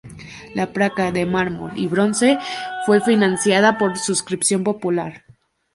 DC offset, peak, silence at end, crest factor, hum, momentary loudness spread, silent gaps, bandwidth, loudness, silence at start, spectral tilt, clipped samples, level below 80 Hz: under 0.1%; -2 dBFS; 0.55 s; 18 dB; none; 10 LU; none; 11.5 kHz; -19 LUFS; 0.05 s; -4 dB/octave; under 0.1%; -54 dBFS